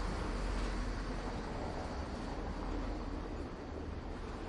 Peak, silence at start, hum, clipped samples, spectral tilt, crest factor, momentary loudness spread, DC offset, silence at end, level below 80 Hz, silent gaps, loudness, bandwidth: -26 dBFS; 0 s; none; under 0.1%; -6 dB/octave; 12 dB; 5 LU; under 0.1%; 0 s; -42 dBFS; none; -42 LUFS; 11 kHz